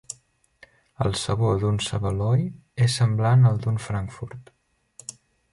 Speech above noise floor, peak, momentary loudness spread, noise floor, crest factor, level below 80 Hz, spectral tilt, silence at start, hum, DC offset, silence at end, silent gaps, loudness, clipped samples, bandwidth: 38 dB; -8 dBFS; 21 LU; -60 dBFS; 16 dB; -46 dBFS; -6 dB/octave; 0.1 s; none; under 0.1%; 0.4 s; none; -23 LUFS; under 0.1%; 11.5 kHz